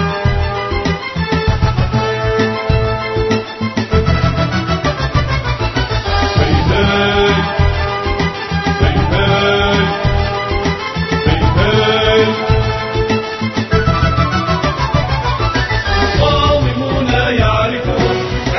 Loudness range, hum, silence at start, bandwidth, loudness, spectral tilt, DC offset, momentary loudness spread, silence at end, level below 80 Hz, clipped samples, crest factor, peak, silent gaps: 2 LU; none; 0 s; 6.2 kHz; -14 LUFS; -6 dB/octave; under 0.1%; 5 LU; 0 s; -22 dBFS; under 0.1%; 14 dB; 0 dBFS; none